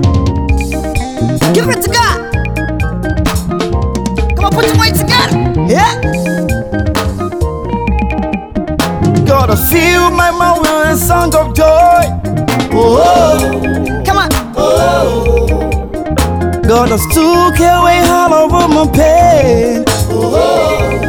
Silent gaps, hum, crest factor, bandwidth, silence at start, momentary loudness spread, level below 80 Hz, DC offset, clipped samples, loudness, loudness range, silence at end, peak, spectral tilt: none; none; 10 dB; over 20 kHz; 0 s; 8 LU; -20 dBFS; under 0.1%; under 0.1%; -10 LUFS; 5 LU; 0 s; 0 dBFS; -5.5 dB/octave